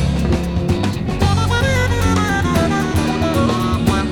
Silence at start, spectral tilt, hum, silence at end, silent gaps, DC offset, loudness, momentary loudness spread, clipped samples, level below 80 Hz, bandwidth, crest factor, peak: 0 s; -6 dB/octave; none; 0 s; none; under 0.1%; -17 LUFS; 3 LU; under 0.1%; -26 dBFS; 17.5 kHz; 14 dB; -2 dBFS